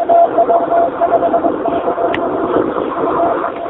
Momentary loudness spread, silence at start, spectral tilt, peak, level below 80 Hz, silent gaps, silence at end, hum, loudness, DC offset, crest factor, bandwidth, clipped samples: 6 LU; 0 s; -5 dB/octave; 0 dBFS; -48 dBFS; none; 0 s; none; -14 LUFS; under 0.1%; 14 dB; 4 kHz; under 0.1%